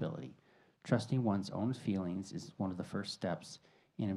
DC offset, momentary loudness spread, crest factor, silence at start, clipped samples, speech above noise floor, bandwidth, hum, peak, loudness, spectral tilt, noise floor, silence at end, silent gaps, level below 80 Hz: under 0.1%; 18 LU; 22 dB; 0 s; under 0.1%; 31 dB; 12 kHz; none; -16 dBFS; -38 LUFS; -6.5 dB/octave; -68 dBFS; 0 s; none; -76 dBFS